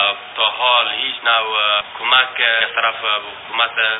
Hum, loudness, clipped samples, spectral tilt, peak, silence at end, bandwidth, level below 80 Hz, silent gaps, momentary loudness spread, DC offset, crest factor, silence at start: none; -16 LUFS; under 0.1%; 4.5 dB/octave; 0 dBFS; 0 s; 4.3 kHz; -64 dBFS; none; 5 LU; under 0.1%; 18 dB; 0 s